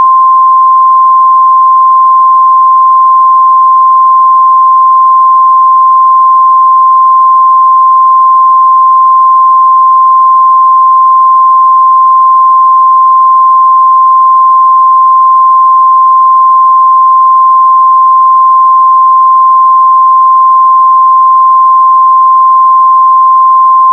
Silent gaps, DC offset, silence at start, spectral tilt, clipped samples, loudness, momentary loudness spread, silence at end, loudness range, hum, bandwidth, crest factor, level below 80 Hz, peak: none; under 0.1%; 0 s; 10 dB/octave; under 0.1%; -3 LUFS; 0 LU; 0 s; 0 LU; none; 1.2 kHz; 4 dB; under -90 dBFS; 0 dBFS